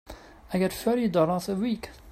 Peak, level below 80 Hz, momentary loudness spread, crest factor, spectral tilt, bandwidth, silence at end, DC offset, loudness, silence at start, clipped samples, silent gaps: -10 dBFS; -52 dBFS; 14 LU; 18 dB; -6.5 dB/octave; 16 kHz; 0 s; under 0.1%; -27 LUFS; 0.05 s; under 0.1%; none